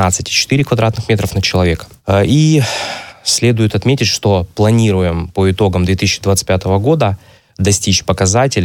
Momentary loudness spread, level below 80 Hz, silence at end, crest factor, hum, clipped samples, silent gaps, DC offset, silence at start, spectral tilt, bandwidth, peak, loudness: 5 LU; -36 dBFS; 0 s; 12 dB; none; under 0.1%; none; under 0.1%; 0 s; -4.5 dB/octave; 17.5 kHz; 0 dBFS; -13 LUFS